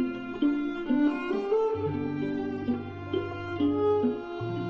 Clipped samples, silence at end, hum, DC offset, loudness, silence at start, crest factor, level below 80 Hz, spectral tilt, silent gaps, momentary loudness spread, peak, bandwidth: under 0.1%; 0 s; none; under 0.1%; -29 LUFS; 0 s; 14 dB; -54 dBFS; -8.5 dB/octave; none; 7 LU; -16 dBFS; 6.6 kHz